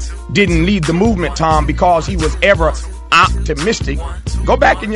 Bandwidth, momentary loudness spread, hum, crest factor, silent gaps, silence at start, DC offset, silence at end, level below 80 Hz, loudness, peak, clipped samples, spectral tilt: 11.5 kHz; 8 LU; none; 14 dB; none; 0 s; under 0.1%; 0 s; -22 dBFS; -14 LUFS; 0 dBFS; under 0.1%; -5 dB/octave